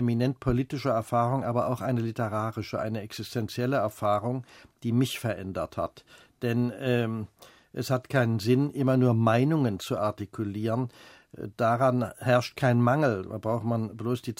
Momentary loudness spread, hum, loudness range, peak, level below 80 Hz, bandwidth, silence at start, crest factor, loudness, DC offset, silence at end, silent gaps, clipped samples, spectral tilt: 11 LU; none; 4 LU; -8 dBFS; -56 dBFS; 16 kHz; 0 s; 20 dB; -28 LUFS; under 0.1%; 0.05 s; none; under 0.1%; -7 dB/octave